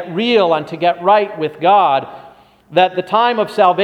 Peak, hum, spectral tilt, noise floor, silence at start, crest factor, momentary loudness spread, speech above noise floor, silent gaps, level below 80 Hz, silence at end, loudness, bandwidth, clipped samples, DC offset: 0 dBFS; none; -6 dB/octave; -43 dBFS; 0 s; 14 dB; 7 LU; 29 dB; none; -64 dBFS; 0 s; -14 LUFS; 11 kHz; under 0.1%; under 0.1%